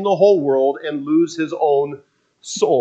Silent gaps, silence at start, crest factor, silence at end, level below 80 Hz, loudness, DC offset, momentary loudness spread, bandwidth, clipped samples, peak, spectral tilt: none; 0 s; 16 dB; 0 s; -72 dBFS; -18 LUFS; under 0.1%; 14 LU; 8.6 kHz; under 0.1%; 0 dBFS; -5.5 dB/octave